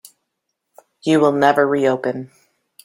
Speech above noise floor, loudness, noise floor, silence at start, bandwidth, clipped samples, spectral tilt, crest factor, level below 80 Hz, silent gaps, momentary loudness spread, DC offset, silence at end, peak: 60 dB; -17 LUFS; -76 dBFS; 1.05 s; 16.5 kHz; under 0.1%; -6 dB/octave; 18 dB; -66 dBFS; none; 12 LU; under 0.1%; 0.6 s; -2 dBFS